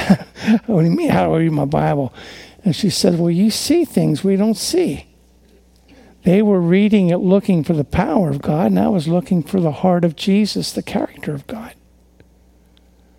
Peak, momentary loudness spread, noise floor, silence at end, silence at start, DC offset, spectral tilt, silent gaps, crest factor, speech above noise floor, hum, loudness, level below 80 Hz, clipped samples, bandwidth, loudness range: 0 dBFS; 9 LU; -51 dBFS; 1.45 s; 0 s; under 0.1%; -6.5 dB/octave; none; 16 dB; 35 dB; none; -17 LUFS; -44 dBFS; under 0.1%; 16.5 kHz; 4 LU